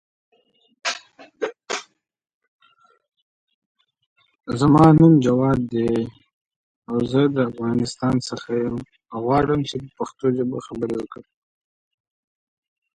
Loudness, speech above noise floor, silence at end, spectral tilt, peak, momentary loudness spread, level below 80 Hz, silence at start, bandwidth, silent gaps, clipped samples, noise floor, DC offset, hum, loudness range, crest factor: -20 LUFS; 40 dB; 1.8 s; -7 dB/octave; -2 dBFS; 17 LU; -50 dBFS; 0.85 s; 9.6 kHz; 2.34-2.41 s, 2.48-2.59 s, 3.22-3.47 s, 3.54-3.75 s, 4.06-4.16 s, 6.33-6.45 s, 6.56-6.82 s; under 0.1%; -59 dBFS; under 0.1%; none; 15 LU; 20 dB